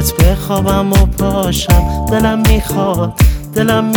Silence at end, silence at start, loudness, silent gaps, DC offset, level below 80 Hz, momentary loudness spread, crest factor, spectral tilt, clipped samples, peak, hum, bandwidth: 0 s; 0 s; -13 LUFS; none; under 0.1%; -16 dBFS; 4 LU; 12 dB; -5.5 dB/octave; under 0.1%; 0 dBFS; none; over 20 kHz